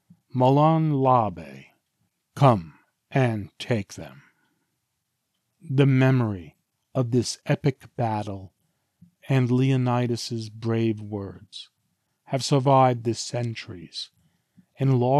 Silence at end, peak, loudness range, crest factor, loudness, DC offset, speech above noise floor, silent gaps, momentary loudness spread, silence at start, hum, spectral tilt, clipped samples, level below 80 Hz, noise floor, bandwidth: 0 s; -4 dBFS; 3 LU; 20 dB; -24 LUFS; under 0.1%; 55 dB; none; 19 LU; 0.35 s; none; -7 dB/octave; under 0.1%; -66 dBFS; -78 dBFS; 12 kHz